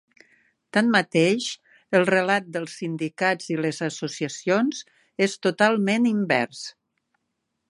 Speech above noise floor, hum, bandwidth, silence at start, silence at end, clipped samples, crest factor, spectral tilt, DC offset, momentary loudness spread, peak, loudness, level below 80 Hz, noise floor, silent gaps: 55 dB; none; 11.5 kHz; 0.75 s; 1 s; under 0.1%; 20 dB; -5 dB/octave; under 0.1%; 11 LU; -4 dBFS; -23 LUFS; -74 dBFS; -78 dBFS; none